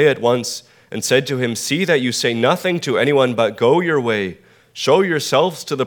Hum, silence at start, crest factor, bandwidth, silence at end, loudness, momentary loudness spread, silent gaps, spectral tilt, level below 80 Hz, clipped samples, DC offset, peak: none; 0 s; 16 dB; 20 kHz; 0 s; -17 LUFS; 9 LU; none; -4 dB/octave; -66 dBFS; under 0.1%; under 0.1%; 0 dBFS